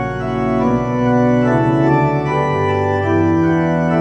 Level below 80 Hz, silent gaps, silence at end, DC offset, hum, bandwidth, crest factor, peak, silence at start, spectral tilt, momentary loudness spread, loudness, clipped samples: -40 dBFS; none; 0 s; under 0.1%; none; 8.4 kHz; 12 dB; -2 dBFS; 0 s; -8.5 dB/octave; 3 LU; -15 LUFS; under 0.1%